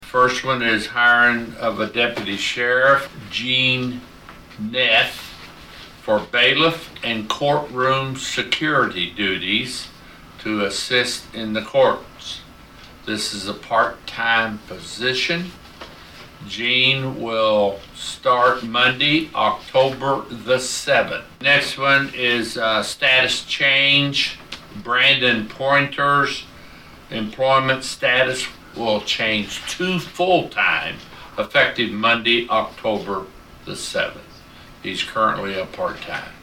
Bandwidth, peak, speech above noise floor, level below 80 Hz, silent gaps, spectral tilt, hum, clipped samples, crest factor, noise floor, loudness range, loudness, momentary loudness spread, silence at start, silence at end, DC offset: 16.5 kHz; -4 dBFS; 23 dB; -50 dBFS; none; -3.5 dB/octave; none; under 0.1%; 18 dB; -43 dBFS; 6 LU; -19 LUFS; 16 LU; 0 s; 0.05 s; under 0.1%